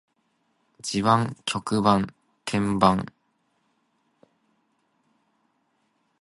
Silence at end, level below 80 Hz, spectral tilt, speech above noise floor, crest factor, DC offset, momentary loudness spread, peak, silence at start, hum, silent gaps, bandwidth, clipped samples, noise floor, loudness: 3.15 s; -56 dBFS; -5.5 dB/octave; 48 dB; 24 dB; under 0.1%; 14 LU; -2 dBFS; 0.85 s; none; none; 11.5 kHz; under 0.1%; -71 dBFS; -24 LUFS